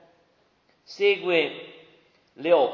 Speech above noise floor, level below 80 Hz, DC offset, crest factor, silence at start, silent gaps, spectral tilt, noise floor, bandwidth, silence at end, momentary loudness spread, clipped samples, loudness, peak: 42 dB; -82 dBFS; under 0.1%; 18 dB; 0.9 s; none; -5 dB/octave; -65 dBFS; 7 kHz; 0 s; 23 LU; under 0.1%; -24 LUFS; -8 dBFS